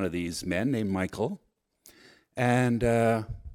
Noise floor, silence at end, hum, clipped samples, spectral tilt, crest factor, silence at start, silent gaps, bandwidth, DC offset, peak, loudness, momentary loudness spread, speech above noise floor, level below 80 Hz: -60 dBFS; 0 s; none; under 0.1%; -6.5 dB/octave; 18 dB; 0 s; none; 16 kHz; under 0.1%; -12 dBFS; -28 LUFS; 9 LU; 33 dB; -50 dBFS